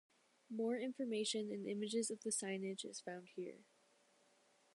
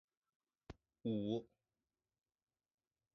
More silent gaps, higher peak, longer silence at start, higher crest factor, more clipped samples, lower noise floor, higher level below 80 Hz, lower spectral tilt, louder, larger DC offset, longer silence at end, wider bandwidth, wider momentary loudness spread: neither; about the same, -28 dBFS vs -28 dBFS; second, 0.5 s vs 0.7 s; about the same, 18 dB vs 22 dB; neither; second, -74 dBFS vs under -90 dBFS; second, under -90 dBFS vs -74 dBFS; second, -3.5 dB/octave vs -8 dB/octave; about the same, -43 LUFS vs -43 LUFS; neither; second, 1.1 s vs 1.7 s; first, 11.5 kHz vs 6.2 kHz; second, 10 LU vs 21 LU